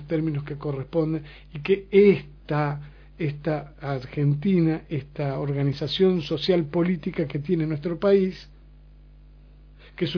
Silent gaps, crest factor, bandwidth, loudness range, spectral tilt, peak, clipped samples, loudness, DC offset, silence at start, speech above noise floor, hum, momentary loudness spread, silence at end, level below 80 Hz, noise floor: none; 20 dB; 5.4 kHz; 3 LU; -8.5 dB/octave; -6 dBFS; under 0.1%; -25 LUFS; under 0.1%; 0 s; 25 dB; none; 10 LU; 0 s; -50 dBFS; -49 dBFS